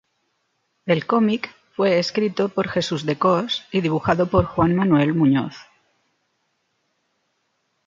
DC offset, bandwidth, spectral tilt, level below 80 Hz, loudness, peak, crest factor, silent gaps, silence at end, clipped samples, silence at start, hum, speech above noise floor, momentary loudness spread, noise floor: under 0.1%; 7.6 kHz; -6.5 dB/octave; -46 dBFS; -20 LUFS; -4 dBFS; 18 dB; none; 2.25 s; under 0.1%; 0.85 s; none; 51 dB; 6 LU; -71 dBFS